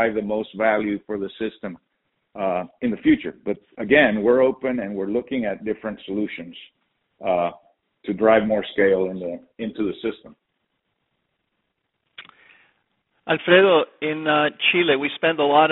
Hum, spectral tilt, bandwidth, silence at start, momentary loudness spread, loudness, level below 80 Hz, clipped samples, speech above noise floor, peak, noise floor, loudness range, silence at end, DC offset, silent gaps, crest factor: none; -2.5 dB/octave; 4.1 kHz; 0 s; 14 LU; -21 LUFS; -58 dBFS; under 0.1%; 54 dB; -2 dBFS; -75 dBFS; 11 LU; 0 s; under 0.1%; none; 20 dB